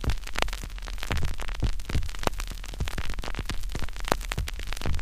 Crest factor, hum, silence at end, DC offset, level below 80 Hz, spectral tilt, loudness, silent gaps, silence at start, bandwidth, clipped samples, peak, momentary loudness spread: 26 dB; none; 0 s; 0.2%; -32 dBFS; -4 dB/octave; -33 LUFS; none; 0 s; 15.5 kHz; under 0.1%; -2 dBFS; 7 LU